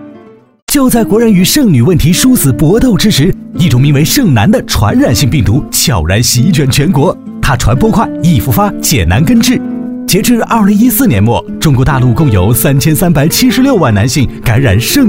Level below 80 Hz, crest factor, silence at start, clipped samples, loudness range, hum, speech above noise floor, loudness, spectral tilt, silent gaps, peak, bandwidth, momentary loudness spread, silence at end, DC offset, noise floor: -24 dBFS; 8 dB; 0 s; under 0.1%; 2 LU; none; 29 dB; -8 LUFS; -5 dB/octave; 0.62-0.67 s; 0 dBFS; 16.5 kHz; 4 LU; 0 s; 0.9%; -36 dBFS